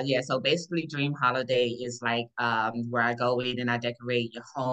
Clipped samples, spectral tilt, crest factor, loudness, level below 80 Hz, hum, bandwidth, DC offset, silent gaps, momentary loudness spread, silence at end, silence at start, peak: under 0.1%; -5 dB/octave; 18 dB; -28 LUFS; -72 dBFS; none; 8.8 kHz; under 0.1%; none; 5 LU; 0 s; 0 s; -10 dBFS